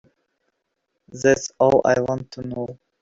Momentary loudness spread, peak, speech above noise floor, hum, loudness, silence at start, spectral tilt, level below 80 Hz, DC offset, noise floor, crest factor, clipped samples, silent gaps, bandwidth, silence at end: 14 LU; -4 dBFS; 56 dB; none; -20 LUFS; 1.15 s; -5 dB/octave; -56 dBFS; under 0.1%; -76 dBFS; 20 dB; under 0.1%; none; 7.8 kHz; 0.25 s